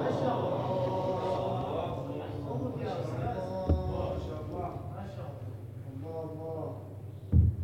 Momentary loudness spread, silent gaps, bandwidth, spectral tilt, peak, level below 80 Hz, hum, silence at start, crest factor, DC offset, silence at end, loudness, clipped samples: 12 LU; none; 8.6 kHz; -8.5 dB/octave; -14 dBFS; -42 dBFS; none; 0 s; 20 dB; under 0.1%; 0 s; -34 LUFS; under 0.1%